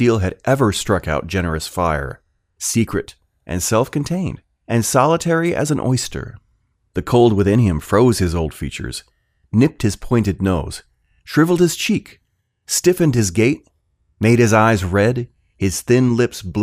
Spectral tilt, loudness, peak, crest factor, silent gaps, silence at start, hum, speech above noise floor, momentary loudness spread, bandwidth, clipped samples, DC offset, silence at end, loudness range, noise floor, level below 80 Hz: -5.5 dB/octave; -18 LUFS; 0 dBFS; 18 dB; none; 0 s; none; 47 dB; 13 LU; 16 kHz; under 0.1%; under 0.1%; 0 s; 4 LU; -63 dBFS; -40 dBFS